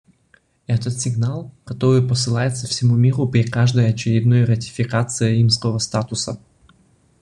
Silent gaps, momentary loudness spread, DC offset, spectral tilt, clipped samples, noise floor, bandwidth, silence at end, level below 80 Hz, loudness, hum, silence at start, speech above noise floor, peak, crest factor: none; 8 LU; under 0.1%; -5.5 dB/octave; under 0.1%; -58 dBFS; 10.5 kHz; 0.85 s; -50 dBFS; -19 LUFS; none; 0.7 s; 40 dB; -4 dBFS; 16 dB